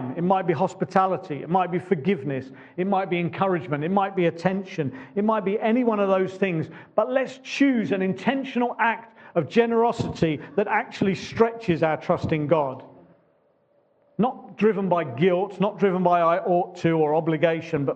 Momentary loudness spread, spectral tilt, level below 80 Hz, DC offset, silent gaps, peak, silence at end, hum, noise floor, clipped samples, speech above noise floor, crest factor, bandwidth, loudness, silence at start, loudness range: 7 LU; -7.5 dB/octave; -62 dBFS; under 0.1%; none; -4 dBFS; 0 s; none; -64 dBFS; under 0.1%; 41 dB; 20 dB; 8.4 kHz; -24 LUFS; 0 s; 3 LU